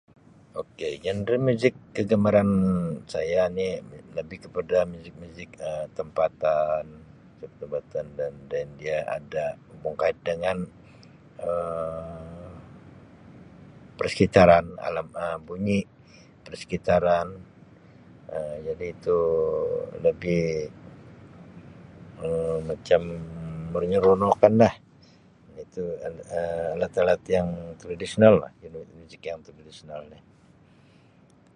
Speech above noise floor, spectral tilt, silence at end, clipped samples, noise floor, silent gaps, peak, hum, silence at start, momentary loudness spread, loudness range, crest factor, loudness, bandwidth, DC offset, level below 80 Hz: 31 dB; -7 dB/octave; 1.4 s; under 0.1%; -56 dBFS; none; -2 dBFS; none; 0.55 s; 22 LU; 7 LU; 24 dB; -25 LUFS; 10.5 kHz; under 0.1%; -52 dBFS